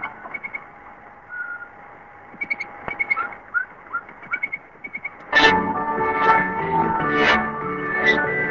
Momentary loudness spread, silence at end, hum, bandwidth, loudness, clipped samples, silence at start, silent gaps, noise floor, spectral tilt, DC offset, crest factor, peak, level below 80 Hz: 16 LU; 0 s; none; 7.6 kHz; -21 LUFS; under 0.1%; 0 s; none; -43 dBFS; -4.5 dB/octave; under 0.1%; 22 dB; 0 dBFS; -50 dBFS